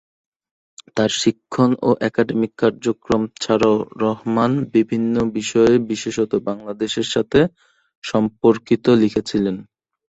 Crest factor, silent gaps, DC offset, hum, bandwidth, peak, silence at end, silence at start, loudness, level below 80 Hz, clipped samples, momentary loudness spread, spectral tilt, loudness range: 18 dB; 7.97-8.02 s; under 0.1%; none; 8.2 kHz; -2 dBFS; 0.5 s; 0.95 s; -19 LUFS; -52 dBFS; under 0.1%; 8 LU; -5.5 dB/octave; 2 LU